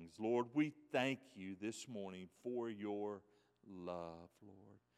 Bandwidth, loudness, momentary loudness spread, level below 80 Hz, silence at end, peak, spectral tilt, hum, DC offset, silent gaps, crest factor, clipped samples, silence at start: 13 kHz; -44 LUFS; 18 LU; -84 dBFS; 0.2 s; -24 dBFS; -5.5 dB/octave; none; under 0.1%; none; 20 dB; under 0.1%; 0 s